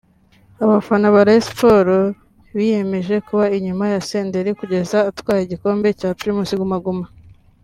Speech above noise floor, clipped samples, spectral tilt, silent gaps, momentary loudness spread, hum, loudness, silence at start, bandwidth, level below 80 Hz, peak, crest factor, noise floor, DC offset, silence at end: 36 dB; under 0.1%; -6.5 dB/octave; none; 10 LU; none; -17 LUFS; 0.6 s; 14 kHz; -50 dBFS; -2 dBFS; 16 dB; -52 dBFS; under 0.1%; 0.55 s